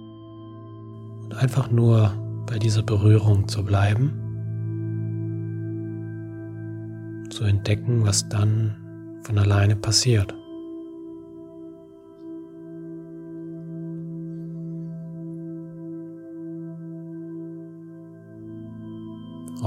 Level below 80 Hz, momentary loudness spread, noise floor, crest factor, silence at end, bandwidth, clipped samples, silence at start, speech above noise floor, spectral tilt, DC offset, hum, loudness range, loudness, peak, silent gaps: -56 dBFS; 21 LU; -45 dBFS; 20 dB; 0 s; 12 kHz; under 0.1%; 0 s; 26 dB; -5.5 dB/octave; under 0.1%; none; 16 LU; -24 LUFS; -4 dBFS; none